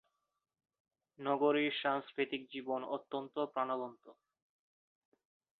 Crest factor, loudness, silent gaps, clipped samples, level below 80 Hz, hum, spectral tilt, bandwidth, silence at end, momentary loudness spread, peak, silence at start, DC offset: 20 dB; -37 LUFS; none; under 0.1%; -88 dBFS; none; -2 dB/octave; 4.5 kHz; 1.45 s; 10 LU; -20 dBFS; 1.2 s; under 0.1%